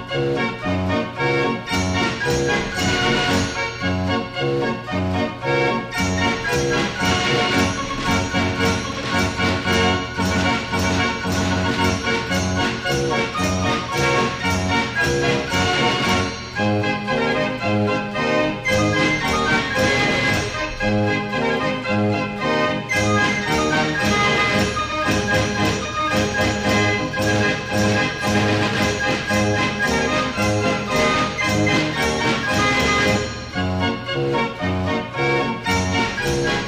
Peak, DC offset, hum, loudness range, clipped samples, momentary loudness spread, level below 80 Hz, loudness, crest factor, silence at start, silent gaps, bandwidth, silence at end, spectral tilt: -6 dBFS; under 0.1%; none; 2 LU; under 0.1%; 4 LU; -40 dBFS; -19 LUFS; 14 dB; 0 s; none; 15.5 kHz; 0 s; -4.5 dB/octave